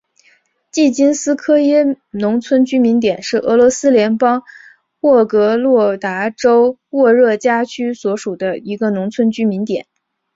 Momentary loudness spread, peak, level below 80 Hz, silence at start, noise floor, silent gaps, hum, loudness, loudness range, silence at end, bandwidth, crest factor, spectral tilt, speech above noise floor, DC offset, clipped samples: 9 LU; -2 dBFS; -58 dBFS; 0.75 s; -55 dBFS; none; none; -14 LUFS; 2 LU; 0.55 s; 8 kHz; 12 dB; -5 dB/octave; 42 dB; under 0.1%; under 0.1%